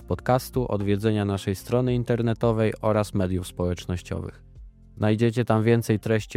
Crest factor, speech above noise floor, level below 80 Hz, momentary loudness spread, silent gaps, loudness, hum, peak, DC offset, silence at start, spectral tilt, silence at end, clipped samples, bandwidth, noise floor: 18 dB; 22 dB; -46 dBFS; 8 LU; none; -25 LUFS; none; -8 dBFS; under 0.1%; 0 s; -7 dB/octave; 0 s; under 0.1%; 15.5 kHz; -46 dBFS